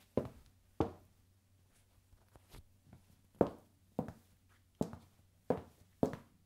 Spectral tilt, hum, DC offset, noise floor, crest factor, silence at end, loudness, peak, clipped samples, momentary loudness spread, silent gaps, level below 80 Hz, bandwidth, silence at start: -8 dB/octave; none; under 0.1%; -70 dBFS; 32 dB; 0.25 s; -41 LUFS; -12 dBFS; under 0.1%; 24 LU; none; -66 dBFS; 16 kHz; 0.15 s